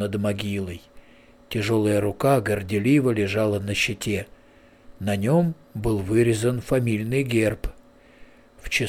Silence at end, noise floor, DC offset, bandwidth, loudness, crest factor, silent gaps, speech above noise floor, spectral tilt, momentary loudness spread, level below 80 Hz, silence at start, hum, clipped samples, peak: 0 s; -53 dBFS; under 0.1%; 16.5 kHz; -23 LUFS; 14 dB; none; 30 dB; -6 dB/octave; 11 LU; -44 dBFS; 0 s; none; under 0.1%; -8 dBFS